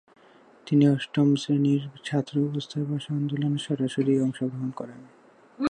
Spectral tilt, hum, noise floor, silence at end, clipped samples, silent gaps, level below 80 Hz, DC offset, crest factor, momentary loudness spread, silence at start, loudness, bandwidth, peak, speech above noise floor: -7 dB/octave; none; -55 dBFS; 0 s; under 0.1%; none; -70 dBFS; under 0.1%; 16 dB; 9 LU; 0.65 s; -26 LUFS; 10 kHz; -10 dBFS; 30 dB